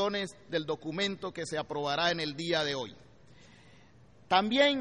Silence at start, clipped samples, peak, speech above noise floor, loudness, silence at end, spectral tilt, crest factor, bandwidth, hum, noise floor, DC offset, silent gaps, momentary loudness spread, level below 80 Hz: 0 s; under 0.1%; -12 dBFS; 28 dB; -31 LUFS; 0 s; -4 dB/octave; 20 dB; 11 kHz; none; -59 dBFS; under 0.1%; none; 10 LU; -66 dBFS